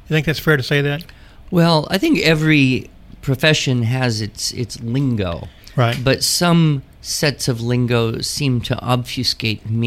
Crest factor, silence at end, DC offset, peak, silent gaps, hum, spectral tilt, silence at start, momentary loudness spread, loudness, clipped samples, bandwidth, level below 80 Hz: 16 dB; 0 s; under 0.1%; -2 dBFS; none; none; -5 dB/octave; 0.05 s; 9 LU; -17 LUFS; under 0.1%; 16.5 kHz; -42 dBFS